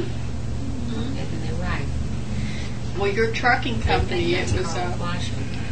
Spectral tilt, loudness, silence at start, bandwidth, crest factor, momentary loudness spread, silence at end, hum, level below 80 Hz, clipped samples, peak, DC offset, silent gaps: -5.5 dB/octave; -25 LUFS; 0 s; 9.2 kHz; 18 dB; 9 LU; 0 s; none; -32 dBFS; under 0.1%; -6 dBFS; 4%; none